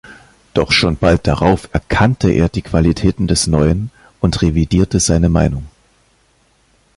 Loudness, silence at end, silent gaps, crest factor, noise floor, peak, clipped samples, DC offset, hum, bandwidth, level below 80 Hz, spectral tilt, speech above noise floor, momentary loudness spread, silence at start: -14 LUFS; 1.3 s; none; 16 dB; -56 dBFS; 0 dBFS; under 0.1%; under 0.1%; none; 11.5 kHz; -26 dBFS; -5.5 dB/octave; 42 dB; 6 LU; 0.05 s